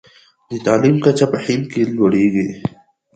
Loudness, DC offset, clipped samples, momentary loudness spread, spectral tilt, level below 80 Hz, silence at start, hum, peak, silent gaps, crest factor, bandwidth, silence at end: -16 LUFS; under 0.1%; under 0.1%; 12 LU; -7 dB/octave; -54 dBFS; 0.5 s; none; 0 dBFS; none; 16 dB; 9.2 kHz; 0.45 s